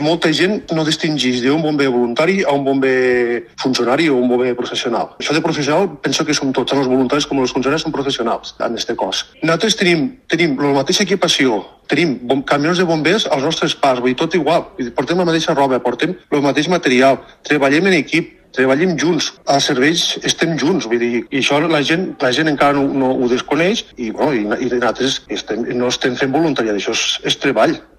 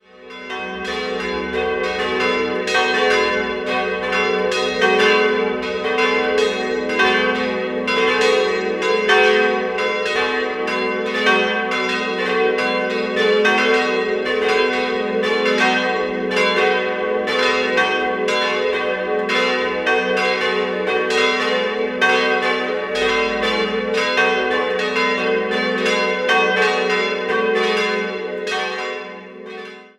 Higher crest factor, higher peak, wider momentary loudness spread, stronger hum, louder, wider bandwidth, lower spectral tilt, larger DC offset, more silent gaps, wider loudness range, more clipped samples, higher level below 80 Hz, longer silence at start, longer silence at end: about the same, 16 dB vs 16 dB; about the same, 0 dBFS vs -2 dBFS; about the same, 6 LU vs 7 LU; neither; about the same, -16 LUFS vs -18 LUFS; first, 14 kHz vs 12 kHz; about the same, -4 dB/octave vs -3.5 dB/octave; neither; neither; about the same, 2 LU vs 2 LU; neither; about the same, -52 dBFS vs -52 dBFS; second, 0 s vs 0.15 s; about the same, 0.2 s vs 0.1 s